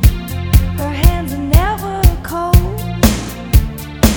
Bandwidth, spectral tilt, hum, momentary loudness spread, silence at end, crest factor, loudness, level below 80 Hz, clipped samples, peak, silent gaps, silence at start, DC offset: over 20 kHz; -5.5 dB/octave; none; 7 LU; 0 s; 12 dB; -15 LUFS; -16 dBFS; 0.3%; 0 dBFS; none; 0 s; under 0.1%